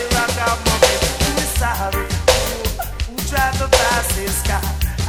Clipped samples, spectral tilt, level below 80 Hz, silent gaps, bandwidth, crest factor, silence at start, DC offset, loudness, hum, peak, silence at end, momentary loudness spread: under 0.1%; -3 dB/octave; -24 dBFS; none; 17.5 kHz; 18 dB; 0 s; under 0.1%; -18 LUFS; none; 0 dBFS; 0 s; 8 LU